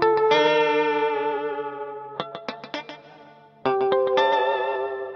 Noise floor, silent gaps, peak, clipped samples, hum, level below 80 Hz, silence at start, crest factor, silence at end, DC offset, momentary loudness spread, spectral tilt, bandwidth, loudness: -49 dBFS; none; -6 dBFS; under 0.1%; none; -70 dBFS; 0 s; 18 dB; 0 s; under 0.1%; 16 LU; -4.5 dB/octave; 6.6 kHz; -23 LUFS